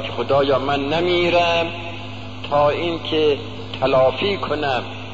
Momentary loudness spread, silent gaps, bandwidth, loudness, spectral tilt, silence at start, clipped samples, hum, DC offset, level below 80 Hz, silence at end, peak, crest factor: 13 LU; none; 7.8 kHz; -19 LUFS; -6 dB/octave; 0 s; under 0.1%; none; 1%; -46 dBFS; 0 s; -6 dBFS; 14 dB